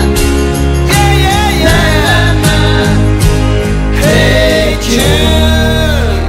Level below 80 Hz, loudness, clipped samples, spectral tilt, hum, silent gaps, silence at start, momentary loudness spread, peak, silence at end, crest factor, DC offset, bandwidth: -14 dBFS; -9 LUFS; 0.2%; -5 dB/octave; none; none; 0 s; 4 LU; 0 dBFS; 0 s; 8 dB; under 0.1%; 16.5 kHz